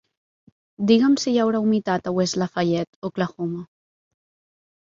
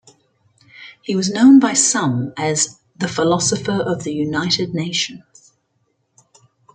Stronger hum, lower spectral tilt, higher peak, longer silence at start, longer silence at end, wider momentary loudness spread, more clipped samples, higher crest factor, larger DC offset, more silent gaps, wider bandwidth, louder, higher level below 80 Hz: neither; first, -5.5 dB/octave vs -3.5 dB/octave; about the same, -4 dBFS vs -2 dBFS; about the same, 0.8 s vs 0.8 s; second, 1.2 s vs 1.55 s; about the same, 12 LU vs 13 LU; neither; about the same, 20 dB vs 18 dB; neither; first, 2.87-3.02 s vs none; second, 7.6 kHz vs 9.6 kHz; second, -22 LUFS vs -17 LUFS; about the same, -64 dBFS vs -60 dBFS